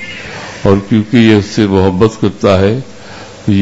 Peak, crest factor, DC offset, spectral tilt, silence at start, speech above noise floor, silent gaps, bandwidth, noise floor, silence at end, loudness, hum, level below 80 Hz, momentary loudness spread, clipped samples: 0 dBFS; 10 dB; under 0.1%; -7 dB/octave; 0 s; 21 dB; none; 8 kHz; -30 dBFS; 0 s; -11 LUFS; none; -40 dBFS; 16 LU; 0.5%